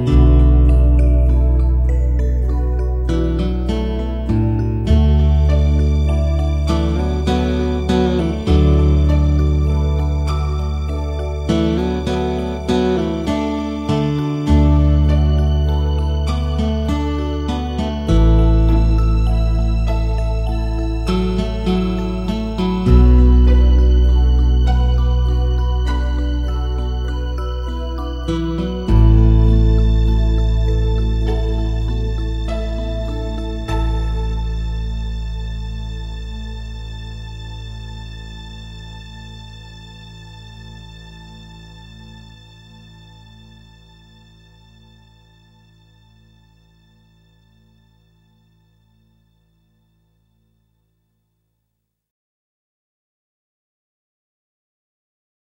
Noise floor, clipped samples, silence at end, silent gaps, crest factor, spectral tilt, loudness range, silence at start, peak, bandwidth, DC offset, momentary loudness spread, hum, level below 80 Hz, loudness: -74 dBFS; under 0.1%; 13.25 s; none; 16 dB; -8 dB/octave; 17 LU; 0 s; 0 dBFS; 7.4 kHz; under 0.1%; 18 LU; none; -18 dBFS; -17 LUFS